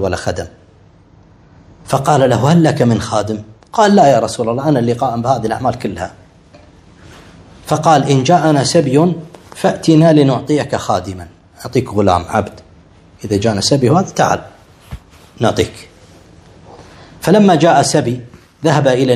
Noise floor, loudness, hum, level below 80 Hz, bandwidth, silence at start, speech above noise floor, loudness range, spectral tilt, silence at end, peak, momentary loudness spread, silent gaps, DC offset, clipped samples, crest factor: -45 dBFS; -13 LUFS; none; -44 dBFS; 14 kHz; 0 s; 33 dB; 5 LU; -6 dB/octave; 0 s; 0 dBFS; 16 LU; none; under 0.1%; 0.2%; 14 dB